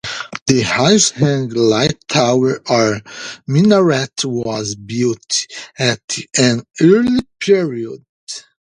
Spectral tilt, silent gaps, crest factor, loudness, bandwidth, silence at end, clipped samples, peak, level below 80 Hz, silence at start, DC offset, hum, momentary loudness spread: -4.5 dB/octave; 0.42-0.46 s, 6.04-6.08 s, 8.09-8.27 s; 16 dB; -15 LUFS; 11 kHz; 0.25 s; under 0.1%; 0 dBFS; -50 dBFS; 0.05 s; under 0.1%; none; 15 LU